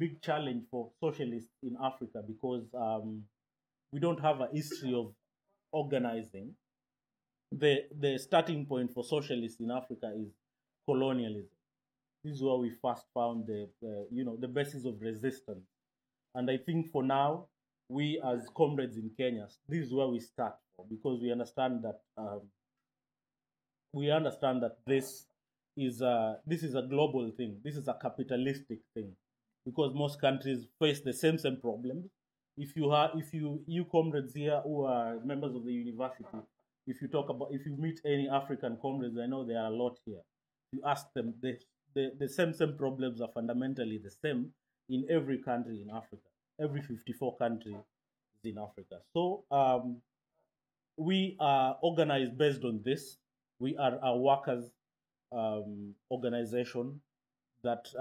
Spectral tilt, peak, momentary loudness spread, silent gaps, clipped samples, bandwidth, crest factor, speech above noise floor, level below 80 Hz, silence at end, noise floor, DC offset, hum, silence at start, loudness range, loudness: -6.5 dB/octave; -14 dBFS; 15 LU; none; under 0.1%; 17 kHz; 22 dB; over 56 dB; -80 dBFS; 0 s; under -90 dBFS; under 0.1%; none; 0 s; 6 LU; -35 LUFS